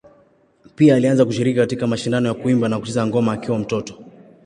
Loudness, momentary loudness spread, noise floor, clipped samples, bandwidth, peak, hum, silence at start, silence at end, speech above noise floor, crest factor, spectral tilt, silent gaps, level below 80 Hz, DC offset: -18 LUFS; 8 LU; -55 dBFS; under 0.1%; 11 kHz; -2 dBFS; none; 0.8 s; 0.35 s; 38 dB; 16 dB; -7 dB/octave; none; -56 dBFS; under 0.1%